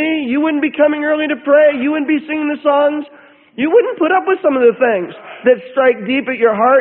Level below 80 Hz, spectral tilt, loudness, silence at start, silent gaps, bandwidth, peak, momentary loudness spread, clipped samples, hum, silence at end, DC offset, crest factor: -62 dBFS; -10.5 dB/octave; -14 LUFS; 0 s; none; 4.1 kHz; 0 dBFS; 8 LU; under 0.1%; none; 0 s; under 0.1%; 14 dB